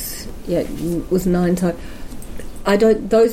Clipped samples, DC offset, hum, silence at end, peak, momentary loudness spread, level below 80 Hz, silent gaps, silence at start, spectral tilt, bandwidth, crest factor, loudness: under 0.1%; under 0.1%; none; 0 s; -4 dBFS; 20 LU; -34 dBFS; none; 0 s; -6.5 dB/octave; 16.5 kHz; 14 dB; -19 LUFS